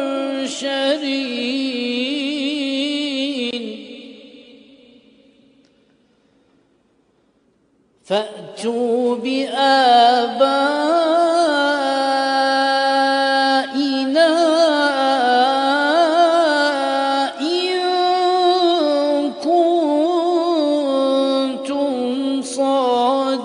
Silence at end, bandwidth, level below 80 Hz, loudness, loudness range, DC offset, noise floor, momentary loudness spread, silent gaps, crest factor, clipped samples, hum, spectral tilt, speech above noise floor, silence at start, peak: 0 s; 10.5 kHz; -72 dBFS; -17 LUFS; 10 LU; under 0.1%; -60 dBFS; 8 LU; none; 16 dB; under 0.1%; none; -2.5 dB/octave; 43 dB; 0 s; -2 dBFS